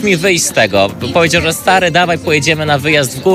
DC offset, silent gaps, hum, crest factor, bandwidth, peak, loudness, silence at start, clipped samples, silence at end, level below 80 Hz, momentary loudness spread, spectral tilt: under 0.1%; none; none; 12 dB; 16 kHz; 0 dBFS; -11 LUFS; 0 s; 0.1%; 0 s; -40 dBFS; 3 LU; -3.5 dB/octave